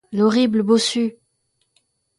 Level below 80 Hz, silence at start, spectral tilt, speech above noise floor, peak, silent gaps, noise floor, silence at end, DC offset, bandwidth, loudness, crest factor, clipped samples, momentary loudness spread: -66 dBFS; 0.1 s; -4.5 dB/octave; 52 dB; -4 dBFS; none; -69 dBFS; 1.05 s; under 0.1%; 11.5 kHz; -18 LUFS; 16 dB; under 0.1%; 7 LU